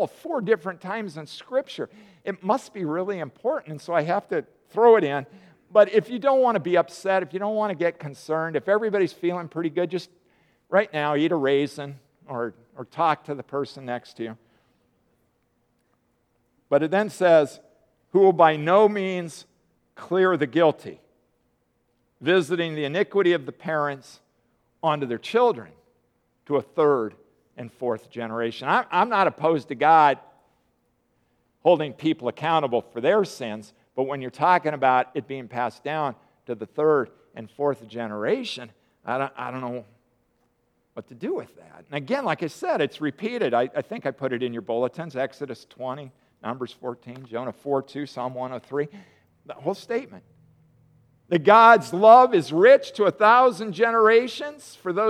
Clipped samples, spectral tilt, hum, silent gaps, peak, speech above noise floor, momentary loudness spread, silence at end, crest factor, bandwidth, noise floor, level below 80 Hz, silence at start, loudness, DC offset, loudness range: under 0.1%; -6 dB/octave; none; none; -2 dBFS; 47 dB; 18 LU; 0 s; 22 dB; 12.5 kHz; -70 dBFS; -76 dBFS; 0 s; -23 LUFS; under 0.1%; 13 LU